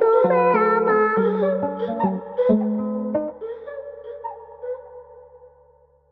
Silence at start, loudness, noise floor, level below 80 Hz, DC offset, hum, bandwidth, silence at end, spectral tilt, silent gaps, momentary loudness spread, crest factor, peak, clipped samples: 0 s; -20 LUFS; -56 dBFS; -62 dBFS; under 0.1%; none; 4.8 kHz; 0.75 s; -10.5 dB/octave; none; 18 LU; 18 dB; -4 dBFS; under 0.1%